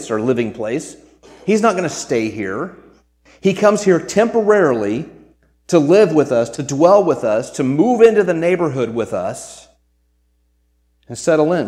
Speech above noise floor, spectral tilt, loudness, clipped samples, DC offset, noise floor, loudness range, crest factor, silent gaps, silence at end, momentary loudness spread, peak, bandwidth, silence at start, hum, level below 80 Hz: 46 dB; -6 dB/octave; -16 LUFS; under 0.1%; under 0.1%; -61 dBFS; 7 LU; 16 dB; none; 0 s; 14 LU; 0 dBFS; 12.5 kHz; 0 s; none; -56 dBFS